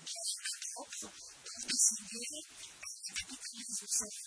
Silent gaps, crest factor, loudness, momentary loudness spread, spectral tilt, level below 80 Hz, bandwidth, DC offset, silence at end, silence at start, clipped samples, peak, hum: none; 26 dB; -36 LUFS; 18 LU; 1 dB/octave; -74 dBFS; 11 kHz; under 0.1%; 0 s; 0 s; under 0.1%; -14 dBFS; none